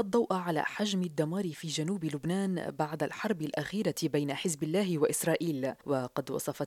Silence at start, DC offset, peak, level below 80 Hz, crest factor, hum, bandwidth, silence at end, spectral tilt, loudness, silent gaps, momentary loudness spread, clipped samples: 0 s; under 0.1%; -16 dBFS; -70 dBFS; 16 dB; none; 16.5 kHz; 0 s; -5 dB/octave; -32 LUFS; none; 5 LU; under 0.1%